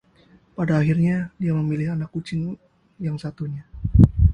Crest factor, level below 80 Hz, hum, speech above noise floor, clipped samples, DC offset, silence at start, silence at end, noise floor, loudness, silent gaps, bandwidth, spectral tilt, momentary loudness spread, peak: 22 dB; -28 dBFS; none; 32 dB; under 0.1%; under 0.1%; 0.6 s; 0 s; -55 dBFS; -23 LUFS; none; 9.4 kHz; -9.5 dB/octave; 15 LU; 0 dBFS